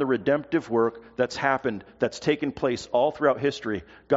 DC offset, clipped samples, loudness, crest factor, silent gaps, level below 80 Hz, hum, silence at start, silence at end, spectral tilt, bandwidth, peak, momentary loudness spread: under 0.1%; under 0.1%; -26 LUFS; 18 dB; none; -60 dBFS; none; 0 s; 0 s; -4 dB/octave; 8 kHz; -6 dBFS; 7 LU